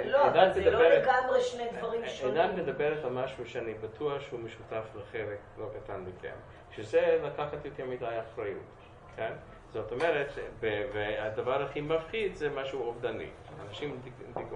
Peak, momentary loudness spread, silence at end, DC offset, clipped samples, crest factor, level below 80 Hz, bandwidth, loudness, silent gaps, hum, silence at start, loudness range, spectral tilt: -8 dBFS; 18 LU; 0 s; under 0.1%; under 0.1%; 24 dB; -56 dBFS; 9.6 kHz; -31 LUFS; none; none; 0 s; 8 LU; -5.5 dB/octave